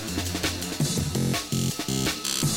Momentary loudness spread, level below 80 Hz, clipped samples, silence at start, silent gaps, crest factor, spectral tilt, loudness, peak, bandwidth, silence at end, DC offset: 2 LU; -44 dBFS; under 0.1%; 0 s; none; 14 dB; -3.5 dB/octave; -26 LUFS; -14 dBFS; 16.5 kHz; 0 s; under 0.1%